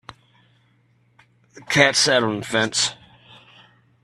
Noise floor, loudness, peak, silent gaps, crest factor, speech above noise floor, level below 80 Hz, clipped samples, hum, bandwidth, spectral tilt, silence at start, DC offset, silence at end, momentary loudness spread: -61 dBFS; -18 LUFS; 0 dBFS; none; 24 dB; 41 dB; -62 dBFS; under 0.1%; none; 13.5 kHz; -2.5 dB/octave; 1.55 s; under 0.1%; 1.1 s; 7 LU